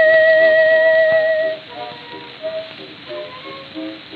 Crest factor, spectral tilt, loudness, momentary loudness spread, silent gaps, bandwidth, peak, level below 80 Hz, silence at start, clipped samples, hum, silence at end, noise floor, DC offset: 14 dB; -5.5 dB/octave; -13 LUFS; 21 LU; none; 4.9 kHz; -2 dBFS; -68 dBFS; 0 s; under 0.1%; none; 0 s; -34 dBFS; under 0.1%